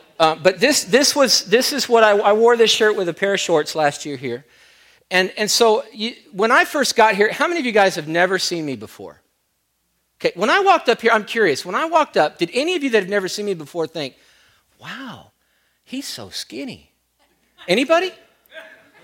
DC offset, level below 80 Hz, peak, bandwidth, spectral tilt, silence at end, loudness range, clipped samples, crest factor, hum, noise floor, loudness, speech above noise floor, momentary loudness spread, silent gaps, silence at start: under 0.1%; -66 dBFS; -2 dBFS; 16.5 kHz; -2.5 dB/octave; 0.4 s; 13 LU; under 0.1%; 18 dB; none; -69 dBFS; -17 LUFS; 51 dB; 15 LU; none; 0.2 s